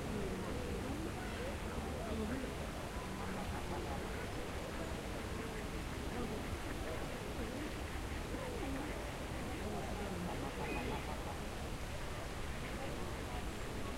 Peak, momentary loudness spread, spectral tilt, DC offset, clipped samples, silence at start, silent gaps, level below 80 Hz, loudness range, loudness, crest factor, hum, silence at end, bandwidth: -28 dBFS; 3 LU; -5 dB/octave; under 0.1%; under 0.1%; 0 s; none; -48 dBFS; 1 LU; -43 LUFS; 14 dB; none; 0 s; 16 kHz